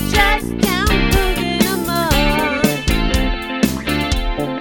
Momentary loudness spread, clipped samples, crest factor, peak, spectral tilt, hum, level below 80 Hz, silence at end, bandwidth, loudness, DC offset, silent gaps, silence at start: 5 LU; under 0.1%; 16 dB; 0 dBFS; -4.5 dB/octave; none; -22 dBFS; 0 s; 17.5 kHz; -17 LUFS; under 0.1%; none; 0 s